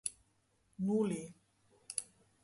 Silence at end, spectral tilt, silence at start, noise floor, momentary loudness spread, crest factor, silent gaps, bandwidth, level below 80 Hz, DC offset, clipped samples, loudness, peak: 0.4 s; -5.5 dB/octave; 0.05 s; -75 dBFS; 22 LU; 22 dB; none; 11.5 kHz; -76 dBFS; under 0.1%; under 0.1%; -38 LUFS; -18 dBFS